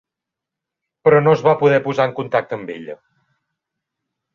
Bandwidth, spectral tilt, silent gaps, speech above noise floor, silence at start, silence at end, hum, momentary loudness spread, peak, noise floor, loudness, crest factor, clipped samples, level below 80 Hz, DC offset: 7 kHz; -7.5 dB/octave; none; 68 dB; 1.05 s; 1.4 s; none; 17 LU; -2 dBFS; -84 dBFS; -16 LUFS; 18 dB; under 0.1%; -62 dBFS; under 0.1%